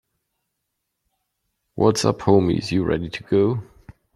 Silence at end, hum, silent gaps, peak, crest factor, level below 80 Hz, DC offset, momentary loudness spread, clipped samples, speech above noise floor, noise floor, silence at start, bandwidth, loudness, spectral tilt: 0.25 s; none; none; -2 dBFS; 20 dB; -50 dBFS; under 0.1%; 8 LU; under 0.1%; 59 dB; -78 dBFS; 1.75 s; 13 kHz; -20 LUFS; -6 dB/octave